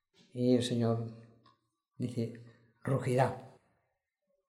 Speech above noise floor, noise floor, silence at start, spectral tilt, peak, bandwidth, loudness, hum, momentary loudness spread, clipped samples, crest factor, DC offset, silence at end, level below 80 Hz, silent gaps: 51 dB; -83 dBFS; 0.35 s; -7 dB/octave; -14 dBFS; 12.5 kHz; -33 LUFS; none; 17 LU; under 0.1%; 22 dB; under 0.1%; 1 s; -74 dBFS; none